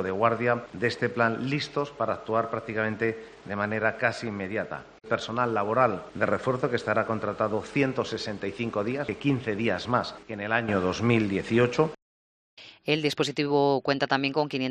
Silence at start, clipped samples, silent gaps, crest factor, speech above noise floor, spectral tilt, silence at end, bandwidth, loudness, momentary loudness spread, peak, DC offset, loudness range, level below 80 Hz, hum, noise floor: 0 s; under 0.1%; 12.02-12.57 s; 20 dB; over 63 dB; -6 dB/octave; 0 s; 10 kHz; -27 LUFS; 7 LU; -6 dBFS; under 0.1%; 3 LU; -62 dBFS; none; under -90 dBFS